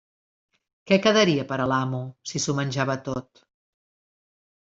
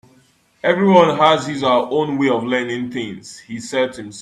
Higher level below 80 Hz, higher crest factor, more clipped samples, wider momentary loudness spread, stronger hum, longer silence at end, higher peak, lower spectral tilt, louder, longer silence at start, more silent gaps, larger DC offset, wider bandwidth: about the same, -60 dBFS vs -60 dBFS; about the same, 20 dB vs 18 dB; neither; second, 13 LU vs 16 LU; neither; first, 1.5 s vs 0 s; second, -6 dBFS vs 0 dBFS; about the same, -4.5 dB/octave vs -5.5 dB/octave; second, -24 LUFS vs -17 LUFS; first, 0.85 s vs 0.65 s; neither; neither; second, 7.8 kHz vs 12 kHz